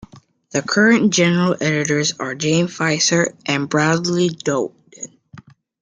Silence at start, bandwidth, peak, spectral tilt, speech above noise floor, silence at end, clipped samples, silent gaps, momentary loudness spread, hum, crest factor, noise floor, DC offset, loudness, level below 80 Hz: 0.55 s; 9.6 kHz; -2 dBFS; -4 dB/octave; 29 dB; 0.4 s; under 0.1%; none; 12 LU; none; 16 dB; -47 dBFS; under 0.1%; -17 LUFS; -58 dBFS